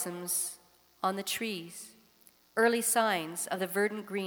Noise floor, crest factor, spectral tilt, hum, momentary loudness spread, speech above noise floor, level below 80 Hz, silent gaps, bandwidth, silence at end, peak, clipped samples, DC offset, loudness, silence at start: -63 dBFS; 20 dB; -2.5 dB/octave; none; 16 LU; 31 dB; -80 dBFS; none; over 20 kHz; 0 s; -12 dBFS; under 0.1%; under 0.1%; -31 LUFS; 0 s